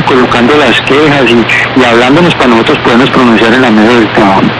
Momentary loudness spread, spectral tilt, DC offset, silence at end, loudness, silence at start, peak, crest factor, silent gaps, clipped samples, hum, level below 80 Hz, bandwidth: 1 LU; -5.5 dB/octave; 0.5%; 0 s; -5 LUFS; 0 s; 0 dBFS; 6 dB; none; 3%; none; -34 dBFS; 11.5 kHz